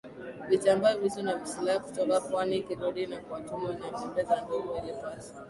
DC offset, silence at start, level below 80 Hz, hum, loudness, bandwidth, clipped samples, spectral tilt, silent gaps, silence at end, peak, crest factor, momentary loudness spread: under 0.1%; 0.05 s; -64 dBFS; none; -30 LUFS; 11.5 kHz; under 0.1%; -5 dB/octave; none; 0 s; -12 dBFS; 18 dB; 13 LU